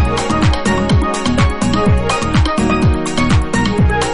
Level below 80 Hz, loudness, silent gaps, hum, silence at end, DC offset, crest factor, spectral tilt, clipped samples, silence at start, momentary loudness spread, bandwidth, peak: -20 dBFS; -14 LUFS; none; none; 0 s; under 0.1%; 12 dB; -5.5 dB/octave; under 0.1%; 0 s; 2 LU; 11 kHz; -2 dBFS